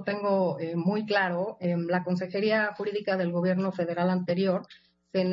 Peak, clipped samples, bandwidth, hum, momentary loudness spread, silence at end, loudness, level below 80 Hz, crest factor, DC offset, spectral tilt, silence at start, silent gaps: -12 dBFS; under 0.1%; 6.8 kHz; none; 4 LU; 0 s; -28 LUFS; -74 dBFS; 16 dB; under 0.1%; -8.5 dB/octave; 0 s; none